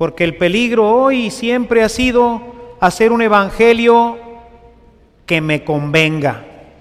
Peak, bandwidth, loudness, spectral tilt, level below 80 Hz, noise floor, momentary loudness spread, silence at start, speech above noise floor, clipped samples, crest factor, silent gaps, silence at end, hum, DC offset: 0 dBFS; 14.5 kHz; -13 LUFS; -5.5 dB/octave; -40 dBFS; -47 dBFS; 8 LU; 0 s; 34 dB; under 0.1%; 14 dB; none; 0.3 s; none; under 0.1%